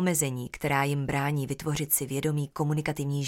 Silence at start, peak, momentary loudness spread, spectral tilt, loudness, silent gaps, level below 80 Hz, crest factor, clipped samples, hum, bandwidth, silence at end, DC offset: 0 s; -12 dBFS; 5 LU; -5 dB/octave; -28 LUFS; none; -54 dBFS; 16 dB; under 0.1%; none; 17 kHz; 0 s; under 0.1%